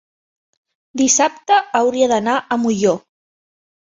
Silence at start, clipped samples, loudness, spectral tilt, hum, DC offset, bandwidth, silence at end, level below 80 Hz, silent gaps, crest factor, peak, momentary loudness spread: 0.95 s; under 0.1%; -16 LUFS; -3 dB/octave; none; under 0.1%; 7.8 kHz; 0.95 s; -62 dBFS; none; 16 dB; -2 dBFS; 5 LU